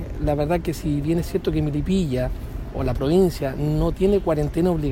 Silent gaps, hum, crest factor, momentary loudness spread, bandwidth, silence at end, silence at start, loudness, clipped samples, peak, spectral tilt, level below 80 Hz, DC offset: none; none; 14 dB; 7 LU; 16.5 kHz; 0 s; 0 s; -22 LUFS; under 0.1%; -8 dBFS; -7.5 dB/octave; -32 dBFS; under 0.1%